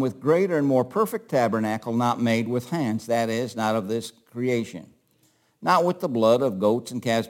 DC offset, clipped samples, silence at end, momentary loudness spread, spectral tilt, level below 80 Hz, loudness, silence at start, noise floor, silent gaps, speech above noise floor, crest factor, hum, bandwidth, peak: under 0.1%; under 0.1%; 0 s; 8 LU; -6 dB/octave; -72 dBFS; -24 LUFS; 0 s; -64 dBFS; none; 41 dB; 16 dB; none; 17 kHz; -6 dBFS